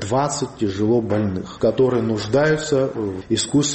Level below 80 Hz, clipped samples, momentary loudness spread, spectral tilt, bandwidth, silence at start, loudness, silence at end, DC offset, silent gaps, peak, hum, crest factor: -50 dBFS; under 0.1%; 5 LU; -5 dB/octave; 8.8 kHz; 0 s; -20 LUFS; 0 s; under 0.1%; none; -6 dBFS; none; 14 dB